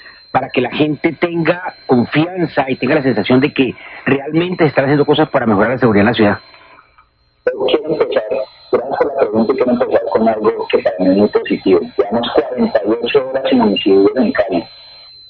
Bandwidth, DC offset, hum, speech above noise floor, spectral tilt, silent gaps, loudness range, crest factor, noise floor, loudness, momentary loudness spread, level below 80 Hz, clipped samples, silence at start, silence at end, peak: 5.2 kHz; under 0.1%; none; 39 dB; -10 dB/octave; none; 3 LU; 14 dB; -52 dBFS; -14 LUFS; 6 LU; -48 dBFS; under 0.1%; 0.05 s; 0.35 s; 0 dBFS